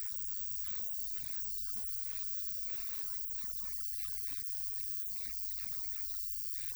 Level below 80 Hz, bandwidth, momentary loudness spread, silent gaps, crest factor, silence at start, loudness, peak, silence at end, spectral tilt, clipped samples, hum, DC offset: -60 dBFS; over 20 kHz; 1 LU; none; 16 dB; 0 s; -36 LUFS; -22 dBFS; 0 s; 0 dB/octave; under 0.1%; none; under 0.1%